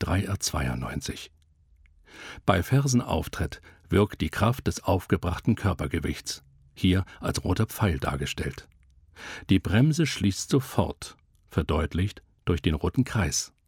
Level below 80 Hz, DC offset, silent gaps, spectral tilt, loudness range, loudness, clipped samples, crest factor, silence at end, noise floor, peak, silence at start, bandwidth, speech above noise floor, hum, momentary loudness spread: -40 dBFS; under 0.1%; none; -5.5 dB/octave; 2 LU; -27 LUFS; under 0.1%; 22 dB; 0.2 s; -60 dBFS; -6 dBFS; 0 s; 18 kHz; 33 dB; none; 13 LU